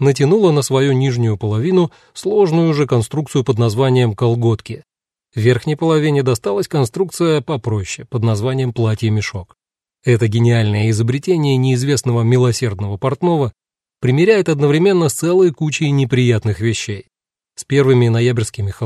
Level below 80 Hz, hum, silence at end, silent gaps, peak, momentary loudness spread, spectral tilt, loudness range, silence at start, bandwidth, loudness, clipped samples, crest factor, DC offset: -50 dBFS; none; 0 s; none; 0 dBFS; 9 LU; -6.5 dB/octave; 3 LU; 0 s; 13 kHz; -16 LUFS; under 0.1%; 14 dB; under 0.1%